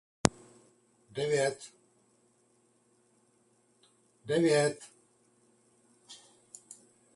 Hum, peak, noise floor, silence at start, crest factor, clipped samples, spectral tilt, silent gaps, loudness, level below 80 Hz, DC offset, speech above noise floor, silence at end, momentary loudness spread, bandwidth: none; -2 dBFS; -69 dBFS; 0.25 s; 34 dB; under 0.1%; -4.5 dB/octave; none; -30 LUFS; -64 dBFS; under 0.1%; 40 dB; 0.4 s; 26 LU; 11.5 kHz